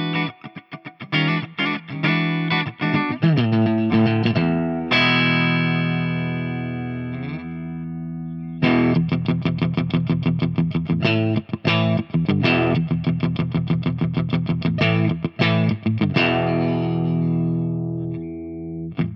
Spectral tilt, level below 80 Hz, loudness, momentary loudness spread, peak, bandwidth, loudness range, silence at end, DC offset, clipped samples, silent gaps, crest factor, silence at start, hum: -8.5 dB/octave; -52 dBFS; -21 LUFS; 12 LU; -4 dBFS; 6 kHz; 4 LU; 0 s; under 0.1%; under 0.1%; none; 16 dB; 0 s; none